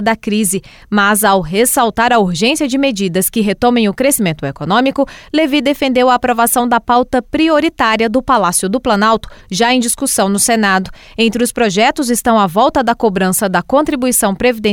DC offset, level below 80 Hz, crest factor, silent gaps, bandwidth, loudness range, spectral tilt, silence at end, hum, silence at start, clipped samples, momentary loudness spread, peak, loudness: under 0.1%; -40 dBFS; 12 dB; none; 18.5 kHz; 1 LU; -3.5 dB/octave; 0 s; none; 0 s; under 0.1%; 4 LU; -2 dBFS; -13 LUFS